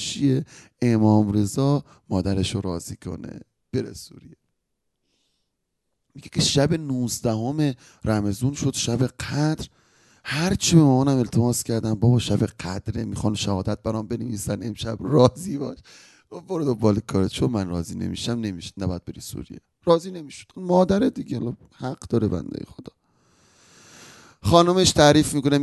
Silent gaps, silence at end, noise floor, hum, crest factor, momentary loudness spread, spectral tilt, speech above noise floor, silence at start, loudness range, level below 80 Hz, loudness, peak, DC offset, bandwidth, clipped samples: none; 0 s; -77 dBFS; none; 22 dB; 17 LU; -5.5 dB/octave; 55 dB; 0 s; 8 LU; -44 dBFS; -23 LUFS; -2 dBFS; under 0.1%; 12.5 kHz; under 0.1%